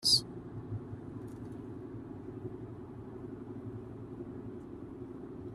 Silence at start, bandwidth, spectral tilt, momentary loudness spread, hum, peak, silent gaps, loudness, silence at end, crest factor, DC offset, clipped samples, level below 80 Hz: 0 s; 13.5 kHz; -4 dB/octave; 3 LU; none; -16 dBFS; none; -40 LUFS; 0 s; 24 dB; under 0.1%; under 0.1%; -60 dBFS